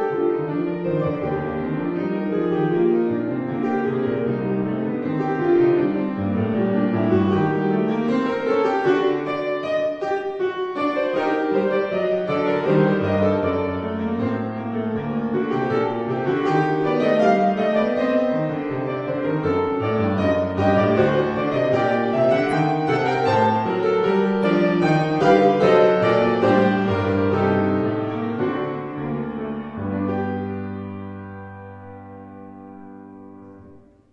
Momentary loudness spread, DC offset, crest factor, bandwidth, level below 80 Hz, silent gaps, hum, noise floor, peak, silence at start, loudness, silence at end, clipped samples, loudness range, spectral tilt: 10 LU; under 0.1%; 18 dB; 8.2 kHz; -58 dBFS; none; none; -48 dBFS; -4 dBFS; 0 s; -21 LUFS; 0.35 s; under 0.1%; 9 LU; -8 dB/octave